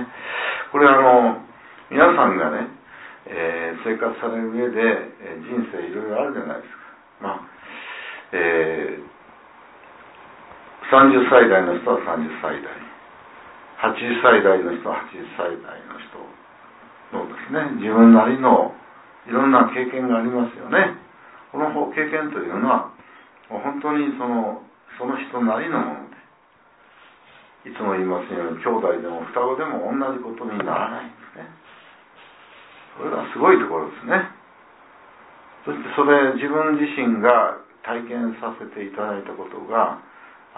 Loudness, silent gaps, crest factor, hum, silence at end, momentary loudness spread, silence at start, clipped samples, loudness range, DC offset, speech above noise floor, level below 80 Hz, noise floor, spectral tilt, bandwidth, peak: -20 LUFS; none; 20 dB; none; 0.3 s; 20 LU; 0 s; under 0.1%; 10 LU; under 0.1%; 36 dB; -66 dBFS; -55 dBFS; -9.5 dB/octave; 4 kHz; -2 dBFS